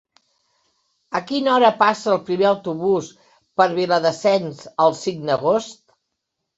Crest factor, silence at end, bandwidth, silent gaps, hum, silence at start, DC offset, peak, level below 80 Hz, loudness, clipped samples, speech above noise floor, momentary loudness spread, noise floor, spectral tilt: 18 dB; 0.85 s; 8 kHz; none; none; 1.1 s; under 0.1%; -2 dBFS; -66 dBFS; -19 LUFS; under 0.1%; 60 dB; 12 LU; -78 dBFS; -5 dB/octave